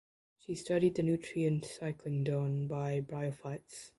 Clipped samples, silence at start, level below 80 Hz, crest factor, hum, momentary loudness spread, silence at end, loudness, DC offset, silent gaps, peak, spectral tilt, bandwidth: under 0.1%; 0.5 s; -68 dBFS; 18 dB; none; 13 LU; 0.1 s; -35 LUFS; under 0.1%; none; -18 dBFS; -7 dB/octave; 11.5 kHz